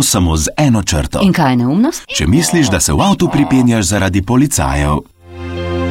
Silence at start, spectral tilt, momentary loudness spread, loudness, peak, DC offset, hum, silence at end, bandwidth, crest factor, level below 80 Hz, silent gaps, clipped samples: 0 s; -4.5 dB/octave; 7 LU; -13 LUFS; 0 dBFS; under 0.1%; none; 0 s; 16.5 kHz; 12 dB; -26 dBFS; none; under 0.1%